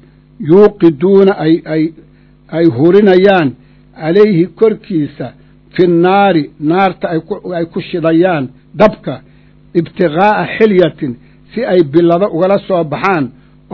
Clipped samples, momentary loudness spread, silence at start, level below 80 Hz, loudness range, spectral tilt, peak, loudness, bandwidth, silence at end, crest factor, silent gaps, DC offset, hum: 1%; 14 LU; 0.4 s; -46 dBFS; 3 LU; -9 dB/octave; 0 dBFS; -11 LUFS; 6 kHz; 0.45 s; 12 dB; none; under 0.1%; none